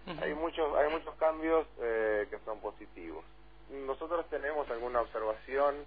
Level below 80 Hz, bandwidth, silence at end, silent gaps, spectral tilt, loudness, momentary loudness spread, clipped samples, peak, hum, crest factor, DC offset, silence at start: -56 dBFS; 5 kHz; 0 s; none; -3 dB/octave; -34 LUFS; 15 LU; under 0.1%; -16 dBFS; none; 18 dB; 0.2%; 0 s